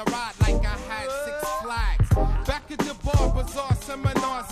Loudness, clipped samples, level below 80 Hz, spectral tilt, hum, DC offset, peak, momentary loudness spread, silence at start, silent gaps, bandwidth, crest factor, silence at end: -26 LUFS; under 0.1%; -28 dBFS; -5.5 dB/octave; none; under 0.1%; -6 dBFS; 7 LU; 0 s; none; 14.5 kHz; 16 dB; 0 s